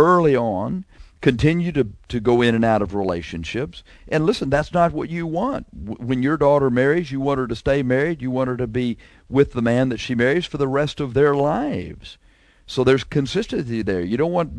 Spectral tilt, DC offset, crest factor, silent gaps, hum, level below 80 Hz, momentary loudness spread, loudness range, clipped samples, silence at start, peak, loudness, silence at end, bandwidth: -7 dB/octave; under 0.1%; 18 dB; none; none; -42 dBFS; 10 LU; 2 LU; under 0.1%; 0 s; -2 dBFS; -20 LUFS; 0 s; 11 kHz